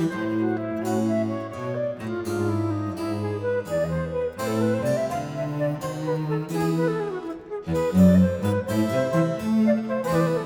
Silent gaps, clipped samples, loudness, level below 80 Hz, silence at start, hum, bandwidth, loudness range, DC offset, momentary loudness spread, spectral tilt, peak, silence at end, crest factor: none; under 0.1%; -25 LUFS; -52 dBFS; 0 s; none; 19 kHz; 5 LU; under 0.1%; 8 LU; -7.5 dB/octave; -6 dBFS; 0 s; 18 dB